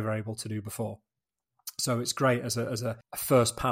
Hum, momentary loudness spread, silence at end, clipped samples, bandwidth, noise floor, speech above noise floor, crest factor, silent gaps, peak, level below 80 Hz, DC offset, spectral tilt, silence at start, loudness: none; 13 LU; 0 s; under 0.1%; 16 kHz; -88 dBFS; 59 dB; 20 dB; none; -10 dBFS; -58 dBFS; under 0.1%; -4.5 dB/octave; 0 s; -29 LUFS